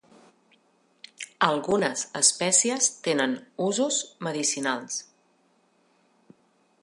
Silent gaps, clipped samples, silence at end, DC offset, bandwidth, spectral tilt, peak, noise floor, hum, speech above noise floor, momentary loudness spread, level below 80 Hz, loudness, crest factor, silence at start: none; under 0.1%; 1.8 s; under 0.1%; 11.5 kHz; -2 dB/octave; -6 dBFS; -66 dBFS; none; 40 dB; 11 LU; -74 dBFS; -24 LUFS; 24 dB; 1.2 s